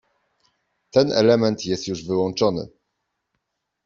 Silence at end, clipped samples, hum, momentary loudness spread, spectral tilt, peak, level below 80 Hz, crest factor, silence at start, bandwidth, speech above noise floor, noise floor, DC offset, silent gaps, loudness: 1.2 s; under 0.1%; none; 10 LU; -5.5 dB/octave; -2 dBFS; -60 dBFS; 20 dB; 0.95 s; 7.6 kHz; 58 dB; -78 dBFS; under 0.1%; none; -21 LUFS